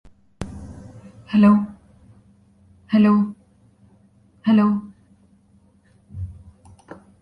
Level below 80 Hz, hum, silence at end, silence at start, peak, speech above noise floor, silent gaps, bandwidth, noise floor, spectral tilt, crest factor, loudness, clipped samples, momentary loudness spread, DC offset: -48 dBFS; none; 0.9 s; 0.4 s; -4 dBFS; 41 dB; none; 5.2 kHz; -56 dBFS; -8.5 dB/octave; 18 dB; -18 LUFS; under 0.1%; 24 LU; under 0.1%